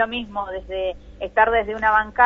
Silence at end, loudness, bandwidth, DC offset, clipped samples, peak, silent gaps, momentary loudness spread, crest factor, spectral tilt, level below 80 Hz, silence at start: 0 s; -21 LUFS; 7 kHz; under 0.1%; under 0.1%; -2 dBFS; none; 11 LU; 18 dB; -5.5 dB/octave; -42 dBFS; 0 s